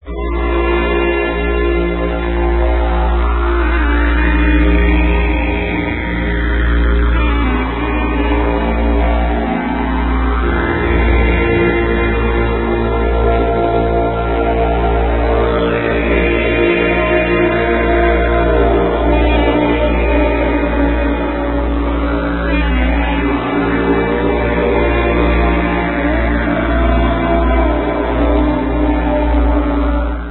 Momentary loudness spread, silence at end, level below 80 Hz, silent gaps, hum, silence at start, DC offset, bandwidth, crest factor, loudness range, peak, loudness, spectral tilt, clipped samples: 4 LU; 0 s; -16 dBFS; none; none; 0.05 s; 0.5%; 4.2 kHz; 12 dB; 3 LU; 0 dBFS; -15 LUFS; -12.5 dB/octave; under 0.1%